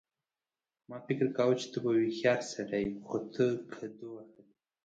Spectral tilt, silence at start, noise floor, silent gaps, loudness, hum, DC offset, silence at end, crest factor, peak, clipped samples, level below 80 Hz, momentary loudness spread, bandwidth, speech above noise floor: -6 dB/octave; 0.9 s; under -90 dBFS; none; -32 LUFS; none; under 0.1%; 0.6 s; 20 dB; -14 dBFS; under 0.1%; -70 dBFS; 18 LU; 9 kHz; over 58 dB